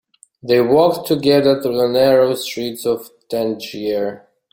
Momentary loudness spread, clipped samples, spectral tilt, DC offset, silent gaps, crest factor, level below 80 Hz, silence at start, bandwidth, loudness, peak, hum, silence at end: 11 LU; under 0.1%; -5.5 dB/octave; under 0.1%; none; 16 dB; -56 dBFS; 0.45 s; 17 kHz; -17 LUFS; -2 dBFS; none; 0.35 s